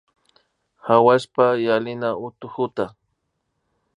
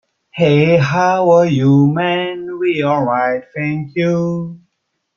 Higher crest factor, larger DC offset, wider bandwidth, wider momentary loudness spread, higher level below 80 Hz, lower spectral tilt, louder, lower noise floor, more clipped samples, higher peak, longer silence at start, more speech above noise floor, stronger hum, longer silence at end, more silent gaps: first, 20 dB vs 14 dB; neither; first, 11 kHz vs 7 kHz; first, 15 LU vs 10 LU; second, -66 dBFS vs -54 dBFS; about the same, -6.5 dB/octave vs -7.5 dB/octave; second, -20 LUFS vs -15 LUFS; about the same, -74 dBFS vs -71 dBFS; neither; about the same, -2 dBFS vs -2 dBFS; first, 0.85 s vs 0.35 s; about the same, 55 dB vs 57 dB; neither; first, 1.1 s vs 0.6 s; neither